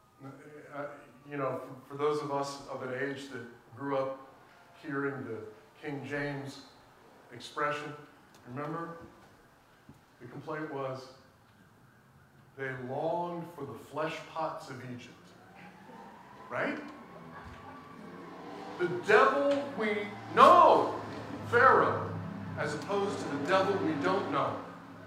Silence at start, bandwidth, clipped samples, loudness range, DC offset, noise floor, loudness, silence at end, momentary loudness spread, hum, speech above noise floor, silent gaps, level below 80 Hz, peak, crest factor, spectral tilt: 0.2 s; 15.5 kHz; under 0.1%; 17 LU; under 0.1%; -61 dBFS; -30 LUFS; 0 s; 25 LU; none; 30 dB; none; -72 dBFS; -6 dBFS; 26 dB; -5.5 dB/octave